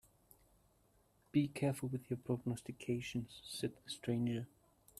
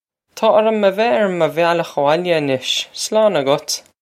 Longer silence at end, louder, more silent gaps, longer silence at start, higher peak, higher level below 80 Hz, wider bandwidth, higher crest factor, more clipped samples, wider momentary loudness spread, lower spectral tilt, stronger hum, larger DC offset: first, 0.55 s vs 0.2 s; second, -41 LUFS vs -16 LUFS; neither; first, 1.35 s vs 0.35 s; second, -22 dBFS vs 0 dBFS; about the same, -70 dBFS vs -70 dBFS; about the same, 14.5 kHz vs 15.5 kHz; about the same, 20 dB vs 16 dB; neither; first, 8 LU vs 5 LU; first, -6 dB/octave vs -4 dB/octave; neither; neither